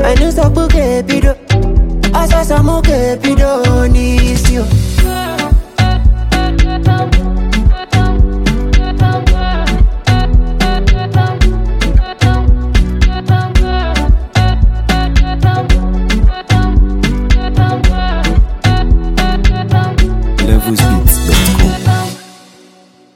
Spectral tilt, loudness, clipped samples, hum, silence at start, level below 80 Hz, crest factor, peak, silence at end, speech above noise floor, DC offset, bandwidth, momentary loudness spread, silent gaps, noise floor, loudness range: -5.5 dB/octave; -12 LUFS; 0.1%; none; 0 s; -12 dBFS; 10 dB; 0 dBFS; 0.9 s; 34 dB; under 0.1%; 16.5 kHz; 3 LU; none; -43 dBFS; 1 LU